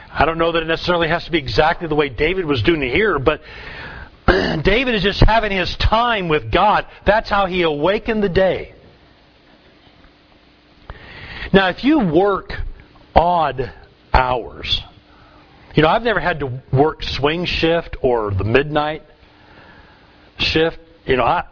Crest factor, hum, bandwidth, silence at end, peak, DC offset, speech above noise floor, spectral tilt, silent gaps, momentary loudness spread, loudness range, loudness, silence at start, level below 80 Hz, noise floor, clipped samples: 18 dB; none; 5.4 kHz; 0.05 s; 0 dBFS; under 0.1%; 34 dB; -6.5 dB/octave; none; 11 LU; 4 LU; -17 LUFS; 0 s; -30 dBFS; -50 dBFS; under 0.1%